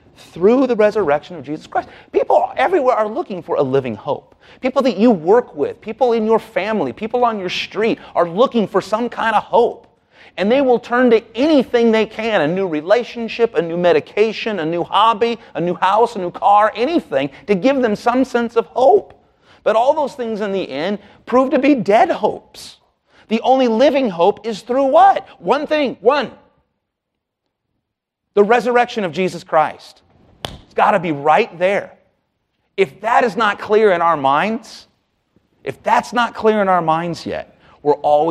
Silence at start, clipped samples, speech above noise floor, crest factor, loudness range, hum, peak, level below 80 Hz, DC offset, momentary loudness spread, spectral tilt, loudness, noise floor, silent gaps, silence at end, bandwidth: 0.35 s; under 0.1%; 61 dB; 16 dB; 3 LU; none; 0 dBFS; -56 dBFS; under 0.1%; 10 LU; -6 dB/octave; -16 LUFS; -77 dBFS; none; 0 s; 12 kHz